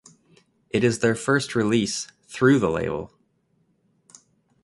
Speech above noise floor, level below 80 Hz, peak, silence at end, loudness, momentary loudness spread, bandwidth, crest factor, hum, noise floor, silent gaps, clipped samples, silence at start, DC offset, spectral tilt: 46 dB; -54 dBFS; -4 dBFS; 1.6 s; -23 LUFS; 13 LU; 11.5 kHz; 20 dB; none; -67 dBFS; none; under 0.1%; 0.75 s; under 0.1%; -5 dB/octave